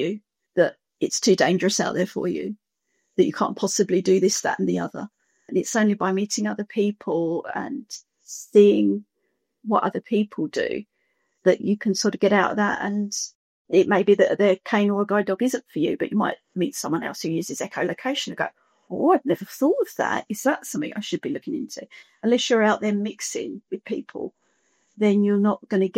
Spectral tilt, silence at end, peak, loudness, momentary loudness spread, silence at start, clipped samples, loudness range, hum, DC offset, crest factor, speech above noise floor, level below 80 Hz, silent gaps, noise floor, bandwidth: -4.5 dB/octave; 0 s; -4 dBFS; -23 LUFS; 13 LU; 0 s; under 0.1%; 4 LU; none; under 0.1%; 20 dB; 52 dB; -70 dBFS; 13.35-13.65 s; -75 dBFS; 16 kHz